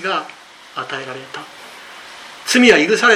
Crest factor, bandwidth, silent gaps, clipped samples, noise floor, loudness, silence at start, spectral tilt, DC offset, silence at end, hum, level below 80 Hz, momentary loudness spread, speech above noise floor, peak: 18 dB; 15.5 kHz; none; under 0.1%; -37 dBFS; -14 LUFS; 0 s; -2.5 dB/octave; under 0.1%; 0 s; none; -58 dBFS; 25 LU; 21 dB; 0 dBFS